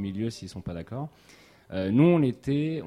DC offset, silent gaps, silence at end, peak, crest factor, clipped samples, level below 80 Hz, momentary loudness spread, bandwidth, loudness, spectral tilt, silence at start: under 0.1%; none; 0 s; -10 dBFS; 16 dB; under 0.1%; -56 dBFS; 17 LU; 11.5 kHz; -26 LUFS; -8 dB/octave; 0 s